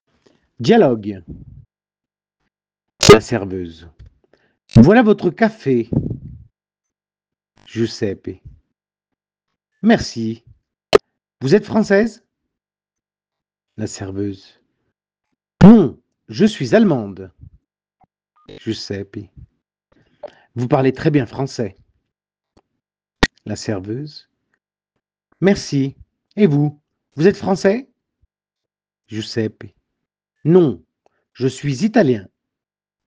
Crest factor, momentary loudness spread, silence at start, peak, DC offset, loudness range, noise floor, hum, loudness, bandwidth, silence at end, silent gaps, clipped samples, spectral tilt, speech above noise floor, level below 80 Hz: 18 dB; 20 LU; 0.6 s; 0 dBFS; under 0.1%; 12 LU; -89 dBFS; none; -16 LUFS; 10.5 kHz; 0.85 s; none; 0.2%; -6 dB/octave; 73 dB; -42 dBFS